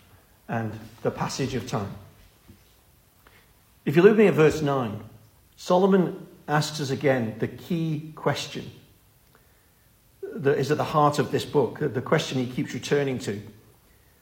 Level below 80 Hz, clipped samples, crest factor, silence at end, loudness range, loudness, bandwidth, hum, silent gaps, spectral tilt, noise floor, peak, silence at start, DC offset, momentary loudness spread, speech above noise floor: -58 dBFS; under 0.1%; 22 dB; 0.7 s; 10 LU; -25 LUFS; 16.5 kHz; none; none; -6 dB/octave; -59 dBFS; -4 dBFS; 0.5 s; under 0.1%; 16 LU; 36 dB